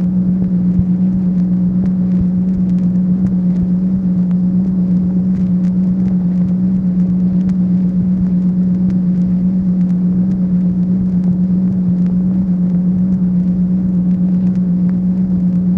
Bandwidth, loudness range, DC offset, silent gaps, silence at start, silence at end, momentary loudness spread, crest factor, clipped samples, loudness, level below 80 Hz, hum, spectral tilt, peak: 2.1 kHz; 0 LU; under 0.1%; none; 0 s; 0 s; 1 LU; 12 dB; under 0.1%; -14 LUFS; -36 dBFS; none; -12 dB/octave; 0 dBFS